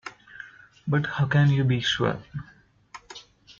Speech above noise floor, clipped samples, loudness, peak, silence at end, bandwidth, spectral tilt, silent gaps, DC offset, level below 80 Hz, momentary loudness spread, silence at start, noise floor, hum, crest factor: 26 dB; under 0.1%; -24 LUFS; -10 dBFS; 0.1 s; 7.2 kHz; -6 dB/octave; none; under 0.1%; -56 dBFS; 23 LU; 0.05 s; -49 dBFS; none; 16 dB